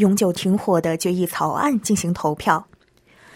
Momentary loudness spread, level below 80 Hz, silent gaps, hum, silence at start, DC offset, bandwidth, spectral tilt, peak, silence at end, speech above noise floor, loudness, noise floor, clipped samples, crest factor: 3 LU; -56 dBFS; none; none; 0 s; under 0.1%; 16.5 kHz; -5.5 dB/octave; -2 dBFS; 0.75 s; 35 dB; -20 LUFS; -54 dBFS; under 0.1%; 18 dB